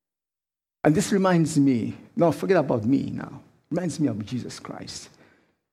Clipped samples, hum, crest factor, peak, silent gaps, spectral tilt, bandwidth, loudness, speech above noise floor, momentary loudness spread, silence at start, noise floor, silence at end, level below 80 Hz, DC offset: under 0.1%; none; 20 dB; -4 dBFS; none; -6.5 dB/octave; 14.5 kHz; -24 LUFS; over 67 dB; 16 LU; 0.85 s; under -90 dBFS; 0.65 s; -60 dBFS; under 0.1%